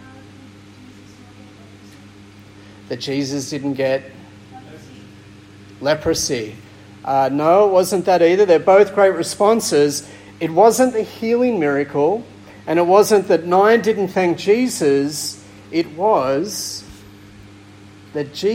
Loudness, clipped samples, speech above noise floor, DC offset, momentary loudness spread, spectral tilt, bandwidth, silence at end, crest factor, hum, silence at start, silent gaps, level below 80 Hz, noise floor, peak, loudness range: -17 LUFS; under 0.1%; 26 dB; under 0.1%; 14 LU; -4.5 dB/octave; 16.5 kHz; 0 s; 16 dB; none; 0.05 s; none; -54 dBFS; -42 dBFS; -2 dBFS; 11 LU